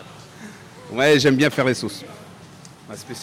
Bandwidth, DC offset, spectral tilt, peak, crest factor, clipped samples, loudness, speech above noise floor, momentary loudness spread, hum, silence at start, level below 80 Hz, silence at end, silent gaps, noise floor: 16 kHz; under 0.1%; -5 dB/octave; -6 dBFS; 16 dB; under 0.1%; -18 LUFS; 24 dB; 25 LU; none; 0 s; -60 dBFS; 0 s; none; -43 dBFS